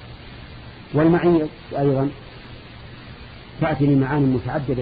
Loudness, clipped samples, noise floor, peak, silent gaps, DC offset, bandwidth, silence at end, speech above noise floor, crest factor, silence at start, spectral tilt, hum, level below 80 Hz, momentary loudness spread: -20 LUFS; under 0.1%; -39 dBFS; -6 dBFS; none; under 0.1%; 5 kHz; 0 s; 20 dB; 16 dB; 0 s; -12 dB/octave; none; -44 dBFS; 22 LU